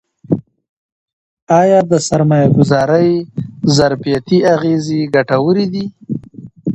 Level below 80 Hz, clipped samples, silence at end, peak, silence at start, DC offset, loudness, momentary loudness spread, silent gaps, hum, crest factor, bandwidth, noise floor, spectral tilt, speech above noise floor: -48 dBFS; under 0.1%; 0 s; 0 dBFS; 0.3 s; under 0.1%; -13 LUFS; 12 LU; 0.69-1.47 s; none; 14 dB; 8.8 kHz; -33 dBFS; -6.5 dB/octave; 21 dB